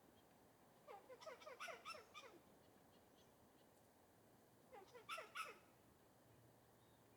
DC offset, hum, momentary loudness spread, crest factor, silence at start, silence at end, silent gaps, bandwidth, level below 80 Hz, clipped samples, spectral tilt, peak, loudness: under 0.1%; none; 13 LU; 24 dB; 0 s; 0 s; none; 19.5 kHz; -90 dBFS; under 0.1%; -2.5 dB/octave; -38 dBFS; -57 LUFS